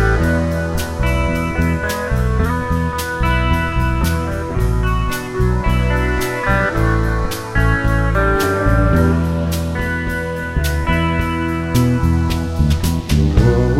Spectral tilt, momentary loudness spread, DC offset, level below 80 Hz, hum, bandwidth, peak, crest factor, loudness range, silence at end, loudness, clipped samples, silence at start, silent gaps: -6.5 dB/octave; 5 LU; under 0.1%; -20 dBFS; none; 16.5 kHz; 0 dBFS; 16 dB; 2 LU; 0 s; -17 LUFS; under 0.1%; 0 s; none